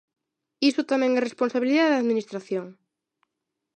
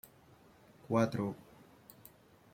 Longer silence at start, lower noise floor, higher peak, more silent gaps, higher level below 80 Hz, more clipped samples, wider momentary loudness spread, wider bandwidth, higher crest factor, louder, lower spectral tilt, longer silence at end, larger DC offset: second, 0.6 s vs 0.9 s; first, -83 dBFS vs -62 dBFS; first, -10 dBFS vs -18 dBFS; neither; second, -82 dBFS vs -70 dBFS; neither; second, 11 LU vs 26 LU; second, 9.2 kHz vs 16.5 kHz; second, 16 dB vs 22 dB; first, -24 LUFS vs -35 LUFS; second, -4.5 dB/octave vs -7 dB/octave; about the same, 1.05 s vs 1.15 s; neither